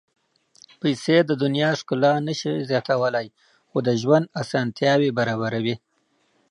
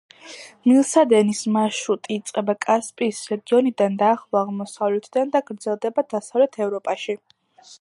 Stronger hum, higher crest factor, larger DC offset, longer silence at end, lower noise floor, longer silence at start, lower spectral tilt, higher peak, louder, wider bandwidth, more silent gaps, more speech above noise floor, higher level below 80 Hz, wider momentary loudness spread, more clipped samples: neither; about the same, 20 dB vs 18 dB; neither; first, 0.75 s vs 0.05 s; first, -67 dBFS vs -42 dBFS; first, 0.85 s vs 0.25 s; about the same, -6 dB/octave vs -5 dB/octave; about the same, -4 dBFS vs -4 dBFS; about the same, -22 LUFS vs -21 LUFS; about the same, 11.5 kHz vs 11.5 kHz; neither; first, 46 dB vs 22 dB; first, -68 dBFS vs -76 dBFS; second, 8 LU vs 11 LU; neither